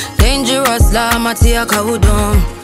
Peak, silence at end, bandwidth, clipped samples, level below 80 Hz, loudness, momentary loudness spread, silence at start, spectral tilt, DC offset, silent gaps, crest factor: 0 dBFS; 0 s; 16.5 kHz; under 0.1%; -14 dBFS; -12 LUFS; 2 LU; 0 s; -4.5 dB/octave; under 0.1%; none; 12 dB